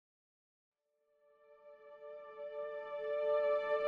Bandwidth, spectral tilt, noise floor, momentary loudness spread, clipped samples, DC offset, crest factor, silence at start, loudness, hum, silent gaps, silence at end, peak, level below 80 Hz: 5 kHz; -4 dB/octave; -79 dBFS; 21 LU; under 0.1%; under 0.1%; 16 dB; 1.5 s; -38 LUFS; none; none; 0 s; -24 dBFS; -82 dBFS